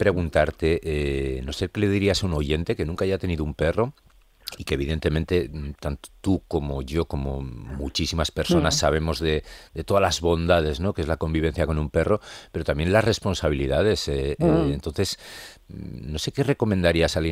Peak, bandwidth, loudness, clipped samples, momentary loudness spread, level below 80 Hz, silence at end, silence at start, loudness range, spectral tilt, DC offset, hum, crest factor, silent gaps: -4 dBFS; 15.5 kHz; -24 LUFS; under 0.1%; 12 LU; -36 dBFS; 0 s; 0 s; 4 LU; -5.5 dB/octave; under 0.1%; none; 18 dB; none